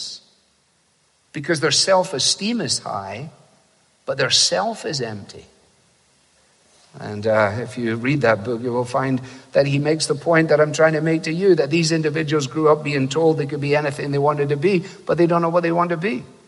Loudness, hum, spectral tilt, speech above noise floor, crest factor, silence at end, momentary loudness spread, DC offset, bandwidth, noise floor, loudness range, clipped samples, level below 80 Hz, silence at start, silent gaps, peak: -19 LUFS; none; -4.5 dB/octave; 43 dB; 18 dB; 0.2 s; 13 LU; under 0.1%; 11.5 kHz; -62 dBFS; 5 LU; under 0.1%; -62 dBFS; 0 s; none; -2 dBFS